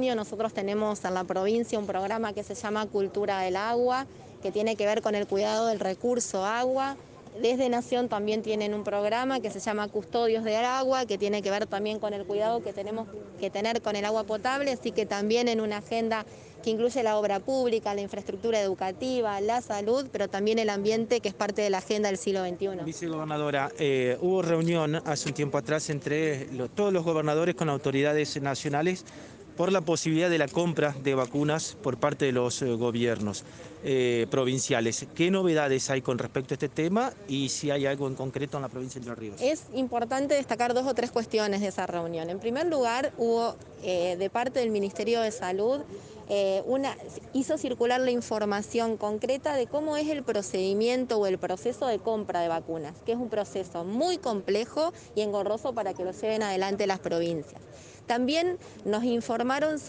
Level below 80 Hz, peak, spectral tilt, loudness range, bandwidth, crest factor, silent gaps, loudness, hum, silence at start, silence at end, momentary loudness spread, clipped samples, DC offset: -64 dBFS; -10 dBFS; -5 dB/octave; 3 LU; 10 kHz; 18 dB; none; -29 LUFS; none; 0 s; 0 s; 7 LU; under 0.1%; under 0.1%